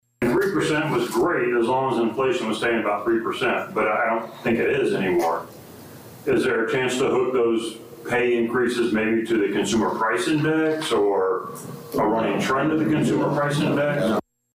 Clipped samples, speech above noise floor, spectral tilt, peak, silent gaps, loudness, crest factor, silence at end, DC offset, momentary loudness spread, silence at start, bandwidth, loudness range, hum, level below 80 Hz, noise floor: under 0.1%; 20 dB; -5.5 dB/octave; -14 dBFS; none; -22 LUFS; 8 dB; 0.35 s; under 0.1%; 6 LU; 0.2 s; 15.5 kHz; 2 LU; none; -56 dBFS; -42 dBFS